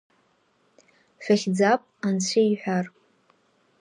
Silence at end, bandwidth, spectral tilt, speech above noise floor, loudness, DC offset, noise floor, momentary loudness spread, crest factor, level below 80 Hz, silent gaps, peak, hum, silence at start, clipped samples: 0.95 s; 10.5 kHz; -5 dB/octave; 43 dB; -23 LUFS; under 0.1%; -66 dBFS; 8 LU; 18 dB; -76 dBFS; none; -8 dBFS; none; 1.2 s; under 0.1%